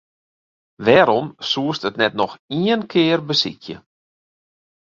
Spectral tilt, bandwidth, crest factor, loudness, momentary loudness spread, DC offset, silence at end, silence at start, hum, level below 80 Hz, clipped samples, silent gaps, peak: -5.5 dB/octave; 7.4 kHz; 20 dB; -18 LUFS; 11 LU; under 0.1%; 1.1 s; 0.8 s; none; -60 dBFS; under 0.1%; 2.39-2.48 s; 0 dBFS